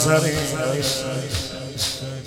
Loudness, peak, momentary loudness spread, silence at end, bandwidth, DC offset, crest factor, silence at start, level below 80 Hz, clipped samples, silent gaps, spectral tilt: -23 LUFS; -4 dBFS; 8 LU; 0 s; 17 kHz; under 0.1%; 20 dB; 0 s; -46 dBFS; under 0.1%; none; -4 dB/octave